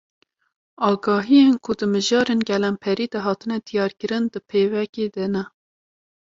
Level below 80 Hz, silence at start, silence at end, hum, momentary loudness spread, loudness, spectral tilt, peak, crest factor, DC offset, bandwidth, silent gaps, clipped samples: -62 dBFS; 0.8 s; 0.8 s; none; 10 LU; -21 LUFS; -5.5 dB/octave; -6 dBFS; 16 dB; under 0.1%; 7.8 kHz; 4.89-4.93 s; under 0.1%